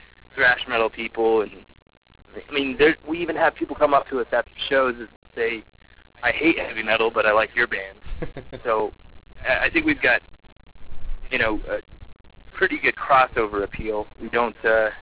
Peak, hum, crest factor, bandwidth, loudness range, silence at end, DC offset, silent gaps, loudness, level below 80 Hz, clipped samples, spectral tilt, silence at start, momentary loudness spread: -6 dBFS; none; 18 dB; 4 kHz; 2 LU; 0 s; 0.1%; 1.82-1.86 s, 1.97-2.02 s, 5.16-5.22 s, 10.52-10.56 s; -22 LUFS; -44 dBFS; under 0.1%; -8 dB/octave; 0.35 s; 15 LU